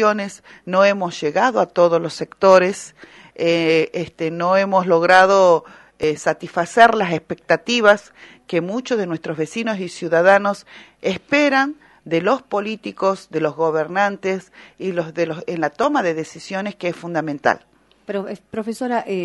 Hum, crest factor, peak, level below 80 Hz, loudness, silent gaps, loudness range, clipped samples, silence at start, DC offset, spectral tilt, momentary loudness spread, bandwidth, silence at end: none; 18 dB; 0 dBFS; -62 dBFS; -18 LUFS; none; 7 LU; under 0.1%; 0 s; under 0.1%; -5 dB/octave; 14 LU; 11.5 kHz; 0 s